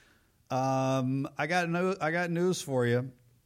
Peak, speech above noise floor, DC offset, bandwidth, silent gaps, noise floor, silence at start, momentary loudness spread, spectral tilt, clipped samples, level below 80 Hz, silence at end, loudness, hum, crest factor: -16 dBFS; 35 dB; under 0.1%; 16 kHz; none; -65 dBFS; 0.5 s; 4 LU; -6 dB/octave; under 0.1%; -70 dBFS; 0.35 s; -30 LUFS; none; 14 dB